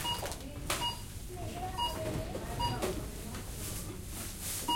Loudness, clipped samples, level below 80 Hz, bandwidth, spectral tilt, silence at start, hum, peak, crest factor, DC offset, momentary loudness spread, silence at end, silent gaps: -38 LUFS; under 0.1%; -46 dBFS; 16.5 kHz; -3.5 dB/octave; 0 s; none; -18 dBFS; 20 dB; under 0.1%; 8 LU; 0 s; none